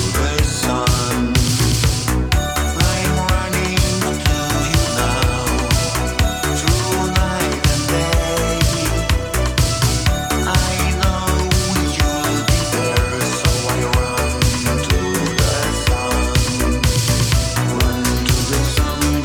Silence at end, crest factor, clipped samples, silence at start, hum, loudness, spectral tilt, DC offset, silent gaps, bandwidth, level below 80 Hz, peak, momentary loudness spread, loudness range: 0 s; 14 dB; under 0.1%; 0 s; none; -17 LUFS; -4 dB/octave; under 0.1%; none; over 20 kHz; -22 dBFS; -2 dBFS; 2 LU; 0 LU